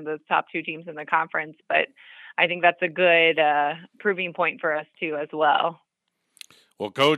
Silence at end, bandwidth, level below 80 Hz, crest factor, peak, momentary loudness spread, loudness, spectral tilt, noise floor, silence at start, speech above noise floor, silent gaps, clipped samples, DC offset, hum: 0 s; 13.5 kHz; -84 dBFS; 22 dB; -4 dBFS; 12 LU; -23 LUFS; -4.5 dB/octave; -77 dBFS; 0 s; 54 dB; none; under 0.1%; under 0.1%; none